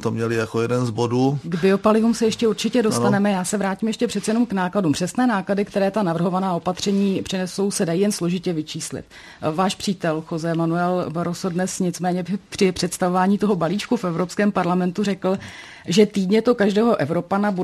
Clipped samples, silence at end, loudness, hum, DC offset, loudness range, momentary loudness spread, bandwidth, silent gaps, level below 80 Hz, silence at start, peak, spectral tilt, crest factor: under 0.1%; 0 s; -21 LUFS; none; under 0.1%; 4 LU; 7 LU; 13 kHz; none; -56 dBFS; 0 s; -4 dBFS; -5.5 dB/octave; 18 dB